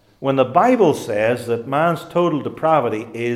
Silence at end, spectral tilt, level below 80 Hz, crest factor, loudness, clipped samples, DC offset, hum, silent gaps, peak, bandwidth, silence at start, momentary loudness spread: 0 s; -6.5 dB/octave; -60 dBFS; 16 dB; -18 LUFS; under 0.1%; under 0.1%; none; none; -2 dBFS; 15.5 kHz; 0.2 s; 7 LU